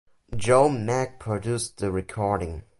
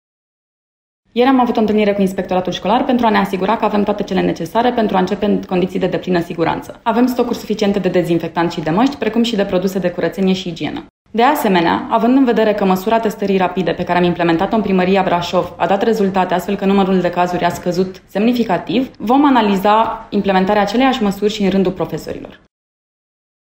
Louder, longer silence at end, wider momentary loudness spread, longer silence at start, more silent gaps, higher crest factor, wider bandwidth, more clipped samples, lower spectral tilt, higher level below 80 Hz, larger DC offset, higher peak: second, -25 LUFS vs -15 LUFS; second, 0.2 s vs 1.15 s; first, 10 LU vs 6 LU; second, 0.3 s vs 1.15 s; second, none vs 10.90-11.05 s; first, 20 dB vs 14 dB; second, 11.5 kHz vs 16 kHz; neither; about the same, -5.5 dB/octave vs -6.5 dB/octave; about the same, -44 dBFS vs -46 dBFS; neither; second, -6 dBFS vs 0 dBFS